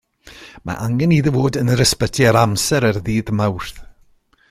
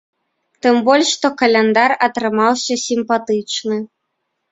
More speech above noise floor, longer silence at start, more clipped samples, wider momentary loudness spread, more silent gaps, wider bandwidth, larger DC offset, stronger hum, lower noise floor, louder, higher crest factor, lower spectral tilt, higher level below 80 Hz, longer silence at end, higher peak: second, 38 dB vs 58 dB; second, 0.25 s vs 0.65 s; neither; first, 14 LU vs 8 LU; neither; first, 16 kHz vs 8.2 kHz; neither; neither; second, -54 dBFS vs -73 dBFS; about the same, -17 LUFS vs -16 LUFS; about the same, 16 dB vs 16 dB; first, -5 dB/octave vs -3 dB/octave; first, -40 dBFS vs -62 dBFS; about the same, 0.65 s vs 0.65 s; about the same, -2 dBFS vs 0 dBFS